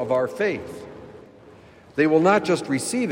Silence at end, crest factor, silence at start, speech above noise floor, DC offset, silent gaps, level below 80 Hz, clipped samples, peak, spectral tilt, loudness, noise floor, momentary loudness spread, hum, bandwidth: 0 s; 16 dB; 0 s; 27 dB; under 0.1%; none; -62 dBFS; under 0.1%; -6 dBFS; -5 dB/octave; -22 LUFS; -48 dBFS; 21 LU; none; 16 kHz